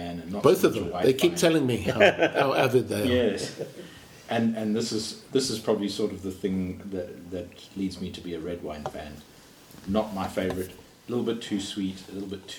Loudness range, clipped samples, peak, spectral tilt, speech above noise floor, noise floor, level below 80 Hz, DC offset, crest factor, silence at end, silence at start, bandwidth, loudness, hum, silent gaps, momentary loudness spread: 11 LU; under 0.1%; -4 dBFS; -5 dB/octave; 24 dB; -50 dBFS; -56 dBFS; under 0.1%; 24 dB; 0 s; 0 s; 19.5 kHz; -27 LUFS; none; none; 16 LU